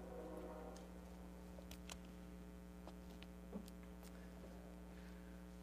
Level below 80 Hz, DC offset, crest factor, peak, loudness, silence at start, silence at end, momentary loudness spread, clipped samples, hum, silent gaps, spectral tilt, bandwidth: -60 dBFS; under 0.1%; 20 dB; -34 dBFS; -56 LUFS; 0 s; 0 s; 4 LU; under 0.1%; none; none; -5.5 dB/octave; 15.5 kHz